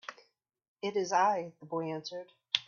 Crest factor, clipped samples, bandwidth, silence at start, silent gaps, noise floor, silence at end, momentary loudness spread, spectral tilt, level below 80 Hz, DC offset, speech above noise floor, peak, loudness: 26 dB; under 0.1%; 7.2 kHz; 0.1 s; 0.68-0.76 s; -69 dBFS; 0.05 s; 16 LU; -3.5 dB/octave; -82 dBFS; under 0.1%; 37 dB; -8 dBFS; -33 LUFS